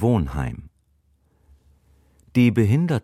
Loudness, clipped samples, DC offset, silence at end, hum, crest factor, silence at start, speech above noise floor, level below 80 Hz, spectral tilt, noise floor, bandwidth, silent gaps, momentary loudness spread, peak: -21 LUFS; under 0.1%; under 0.1%; 0.05 s; none; 18 dB; 0 s; 44 dB; -40 dBFS; -8.5 dB/octave; -63 dBFS; 13.5 kHz; none; 13 LU; -6 dBFS